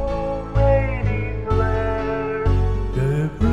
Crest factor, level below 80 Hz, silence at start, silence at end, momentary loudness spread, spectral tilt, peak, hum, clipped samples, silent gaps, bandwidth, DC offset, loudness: 14 dB; -26 dBFS; 0 s; 0 s; 6 LU; -8.5 dB/octave; -6 dBFS; none; under 0.1%; none; 8 kHz; 1%; -21 LUFS